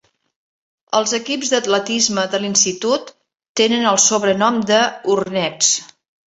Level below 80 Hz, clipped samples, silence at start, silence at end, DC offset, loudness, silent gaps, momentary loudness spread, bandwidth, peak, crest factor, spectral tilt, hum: -62 dBFS; under 0.1%; 0.9 s; 0.4 s; under 0.1%; -16 LUFS; 3.49-3.55 s; 7 LU; 8.4 kHz; 0 dBFS; 18 dB; -2 dB/octave; none